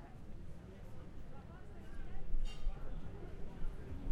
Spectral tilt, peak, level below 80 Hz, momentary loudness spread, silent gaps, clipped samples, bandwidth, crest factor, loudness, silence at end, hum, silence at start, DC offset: -7 dB/octave; -22 dBFS; -42 dBFS; 8 LU; none; under 0.1%; 5.6 kHz; 16 dB; -51 LUFS; 0 s; none; 0 s; under 0.1%